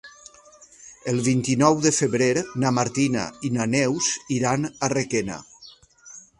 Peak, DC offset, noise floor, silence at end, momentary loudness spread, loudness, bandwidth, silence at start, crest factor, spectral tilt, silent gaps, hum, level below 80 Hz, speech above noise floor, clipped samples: -2 dBFS; under 0.1%; -51 dBFS; 0.2 s; 9 LU; -22 LUFS; 11.5 kHz; 0.05 s; 22 dB; -4.5 dB/octave; none; none; -58 dBFS; 28 dB; under 0.1%